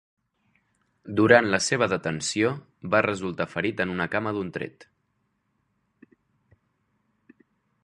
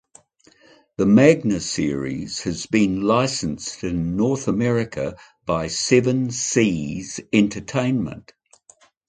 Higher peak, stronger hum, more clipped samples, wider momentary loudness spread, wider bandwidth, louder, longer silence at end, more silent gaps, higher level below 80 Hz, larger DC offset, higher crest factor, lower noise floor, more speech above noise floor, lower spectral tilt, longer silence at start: about the same, -2 dBFS vs 0 dBFS; neither; neither; about the same, 13 LU vs 12 LU; first, 11.5 kHz vs 9.6 kHz; second, -24 LUFS vs -21 LUFS; first, 3 s vs 0.9 s; neither; second, -60 dBFS vs -48 dBFS; neither; about the same, 26 dB vs 22 dB; first, -74 dBFS vs -55 dBFS; first, 49 dB vs 35 dB; about the same, -4.5 dB/octave vs -5 dB/octave; about the same, 1.05 s vs 1 s